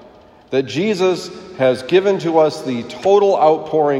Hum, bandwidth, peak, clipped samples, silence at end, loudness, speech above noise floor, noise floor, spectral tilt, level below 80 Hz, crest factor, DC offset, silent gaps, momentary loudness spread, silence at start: none; 12 kHz; 0 dBFS; under 0.1%; 0 s; -16 LUFS; 29 dB; -44 dBFS; -5.5 dB/octave; -60 dBFS; 16 dB; under 0.1%; none; 10 LU; 0.5 s